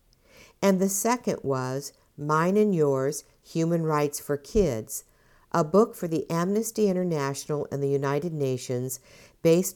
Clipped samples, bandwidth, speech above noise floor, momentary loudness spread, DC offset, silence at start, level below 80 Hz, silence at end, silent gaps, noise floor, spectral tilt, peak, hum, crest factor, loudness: under 0.1%; 19.5 kHz; 30 dB; 11 LU; under 0.1%; 0.6 s; -50 dBFS; 0.05 s; none; -55 dBFS; -6 dB/octave; -8 dBFS; none; 18 dB; -26 LUFS